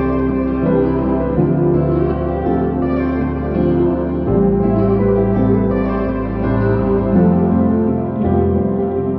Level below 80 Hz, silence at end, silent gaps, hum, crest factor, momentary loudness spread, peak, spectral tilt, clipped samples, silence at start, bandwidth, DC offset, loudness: -28 dBFS; 0 s; none; none; 12 dB; 4 LU; -2 dBFS; -12.5 dB/octave; under 0.1%; 0 s; 4.8 kHz; under 0.1%; -16 LUFS